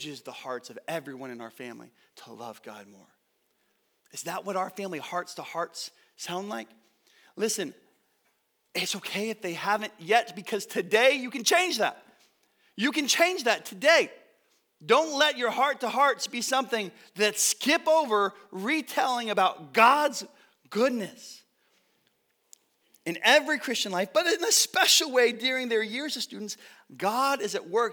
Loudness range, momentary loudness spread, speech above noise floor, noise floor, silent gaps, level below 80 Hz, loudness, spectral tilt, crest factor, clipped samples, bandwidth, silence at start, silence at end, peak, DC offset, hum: 13 LU; 19 LU; 46 dB; -73 dBFS; none; -90 dBFS; -26 LUFS; -1.5 dB/octave; 24 dB; under 0.1%; over 20 kHz; 0 s; 0 s; -6 dBFS; under 0.1%; none